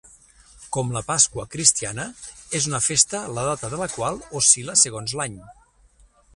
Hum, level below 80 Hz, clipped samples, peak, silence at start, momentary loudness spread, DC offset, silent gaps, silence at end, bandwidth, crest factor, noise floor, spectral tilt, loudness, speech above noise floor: none; -52 dBFS; under 0.1%; 0 dBFS; 0.6 s; 13 LU; under 0.1%; none; 0.85 s; 11.5 kHz; 24 dB; -56 dBFS; -2 dB/octave; -20 LUFS; 33 dB